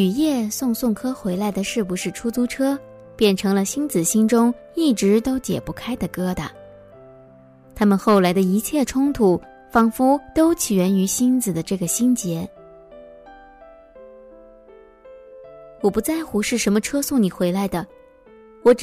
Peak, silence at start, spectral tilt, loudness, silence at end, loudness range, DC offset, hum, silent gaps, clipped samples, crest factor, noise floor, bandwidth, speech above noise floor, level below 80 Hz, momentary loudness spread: -4 dBFS; 0 s; -5 dB/octave; -20 LUFS; 0 s; 8 LU; under 0.1%; none; none; under 0.1%; 16 dB; -48 dBFS; 16 kHz; 28 dB; -48 dBFS; 9 LU